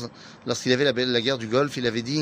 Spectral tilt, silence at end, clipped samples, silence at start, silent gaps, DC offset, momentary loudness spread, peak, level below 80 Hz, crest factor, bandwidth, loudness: -4.5 dB/octave; 0 s; under 0.1%; 0 s; none; under 0.1%; 10 LU; -6 dBFS; -62 dBFS; 18 dB; 15.5 kHz; -24 LUFS